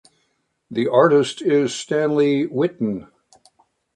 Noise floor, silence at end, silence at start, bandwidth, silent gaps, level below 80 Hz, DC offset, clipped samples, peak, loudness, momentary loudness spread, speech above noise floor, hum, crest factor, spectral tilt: -69 dBFS; 0.95 s; 0.7 s; 10.5 kHz; none; -64 dBFS; under 0.1%; under 0.1%; -2 dBFS; -19 LUFS; 11 LU; 51 dB; none; 18 dB; -5.5 dB/octave